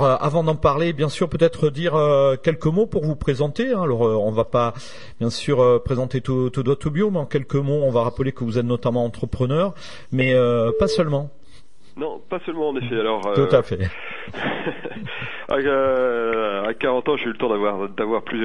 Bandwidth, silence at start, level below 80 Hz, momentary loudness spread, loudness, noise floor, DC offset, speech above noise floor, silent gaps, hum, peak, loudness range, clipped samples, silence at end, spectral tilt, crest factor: 11 kHz; 0 s; -44 dBFS; 10 LU; -21 LUFS; -52 dBFS; 2%; 32 dB; none; none; -2 dBFS; 3 LU; under 0.1%; 0 s; -7 dB/octave; 18 dB